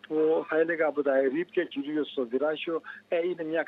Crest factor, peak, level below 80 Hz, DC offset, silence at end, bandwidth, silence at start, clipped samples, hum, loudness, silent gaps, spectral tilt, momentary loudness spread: 16 dB; -12 dBFS; -84 dBFS; under 0.1%; 0 s; 4.6 kHz; 0.1 s; under 0.1%; none; -28 LUFS; none; -7.5 dB/octave; 6 LU